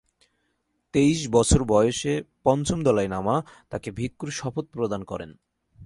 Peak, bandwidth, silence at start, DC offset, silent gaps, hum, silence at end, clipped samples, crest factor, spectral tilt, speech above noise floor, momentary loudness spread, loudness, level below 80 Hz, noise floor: -6 dBFS; 11.5 kHz; 0.95 s; under 0.1%; none; none; 0 s; under 0.1%; 20 dB; -5.5 dB/octave; 50 dB; 14 LU; -24 LUFS; -40 dBFS; -74 dBFS